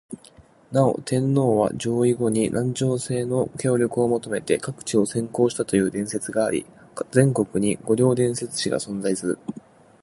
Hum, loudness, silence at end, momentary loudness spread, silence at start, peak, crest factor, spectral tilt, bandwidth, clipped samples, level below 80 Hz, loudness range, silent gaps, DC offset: none; -23 LUFS; 0.45 s; 7 LU; 0.1 s; -2 dBFS; 20 dB; -6 dB/octave; 11.5 kHz; under 0.1%; -58 dBFS; 1 LU; none; under 0.1%